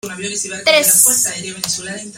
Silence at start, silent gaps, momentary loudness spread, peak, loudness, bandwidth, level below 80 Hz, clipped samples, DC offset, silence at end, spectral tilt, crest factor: 0.05 s; none; 13 LU; 0 dBFS; -13 LUFS; over 20 kHz; -58 dBFS; under 0.1%; under 0.1%; 0 s; -0.5 dB/octave; 16 dB